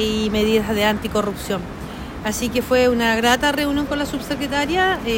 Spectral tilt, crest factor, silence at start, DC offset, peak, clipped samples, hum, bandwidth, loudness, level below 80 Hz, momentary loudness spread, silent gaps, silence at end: -4 dB/octave; 16 dB; 0 s; under 0.1%; -4 dBFS; under 0.1%; none; 16.5 kHz; -19 LUFS; -38 dBFS; 10 LU; none; 0 s